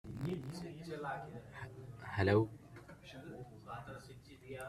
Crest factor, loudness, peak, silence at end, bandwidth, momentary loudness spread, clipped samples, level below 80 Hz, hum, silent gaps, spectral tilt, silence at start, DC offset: 24 dB; -41 LUFS; -18 dBFS; 0 s; 14 kHz; 22 LU; under 0.1%; -66 dBFS; none; none; -7 dB/octave; 0.05 s; under 0.1%